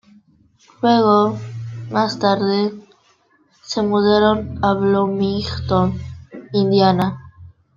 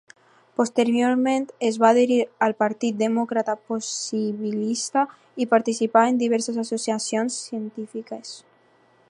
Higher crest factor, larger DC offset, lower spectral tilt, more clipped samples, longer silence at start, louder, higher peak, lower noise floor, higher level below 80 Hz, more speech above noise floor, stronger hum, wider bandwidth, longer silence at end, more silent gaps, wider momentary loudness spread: about the same, 16 dB vs 20 dB; neither; first, -7 dB/octave vs -4 dB/octave; neither; first, 0.8 s vs 0.6 s; first, -18 LUFS vs -23 LUFS; about the same, -2 dBFS vs -4 dBFS; about the same, -58 dBFS vs -59 dBFS; first, -48 dBFS vs -80 dBFS; first, 42 dB vs 36 dB; neither; second, 7.4 kHz vs 11 kHz; second, 0.25 s vs 0.7 s; neither; about the same, 15 LU vs 14 LU